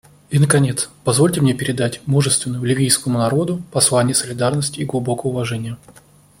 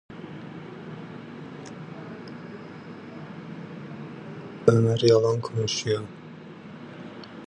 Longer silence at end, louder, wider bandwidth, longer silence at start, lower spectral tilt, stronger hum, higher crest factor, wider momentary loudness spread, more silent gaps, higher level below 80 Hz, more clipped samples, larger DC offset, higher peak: first, 0.5 s vs 0 s; first, -18 LUFS vs -23 LUFS; first, 16.5 kHz vs 9.8 kHz; first, 0.3 s vs 0.1 s; second, -4.5 dB/octave vs -6 dB/octave; neither; second, 18 dB vs 24 dB; second, 8 LU vs 21 LU; neither; first, -52 dBFS vs -62 dBFS; neither; neither; first, 0 dBFS vs -4 dBFS